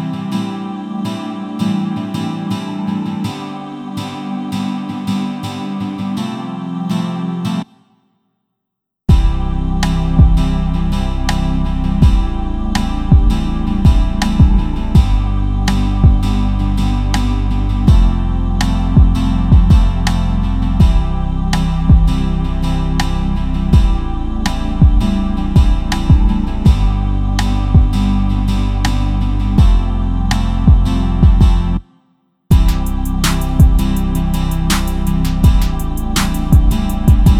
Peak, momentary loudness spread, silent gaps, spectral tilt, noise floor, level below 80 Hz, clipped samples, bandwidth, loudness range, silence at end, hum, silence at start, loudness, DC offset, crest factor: 0 dBFS; 9 LU; none; -6.5 dB/octave; -77 dBFS; -16 dBFS; under 0.1%; 15 kHz; 7 LU; 0 s; none; 0 s; -16 LUFS; under 0.1%; 12 dB